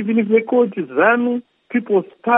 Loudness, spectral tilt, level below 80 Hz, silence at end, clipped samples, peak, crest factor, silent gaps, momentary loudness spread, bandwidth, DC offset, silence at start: -18 LUFS; -11 dB/octave; -78 dBFS; 0 s; under 0.1%; -2 dBFS; 16 dB; none; 9 LU; 3.7 kHz; under 0.1%; 0 s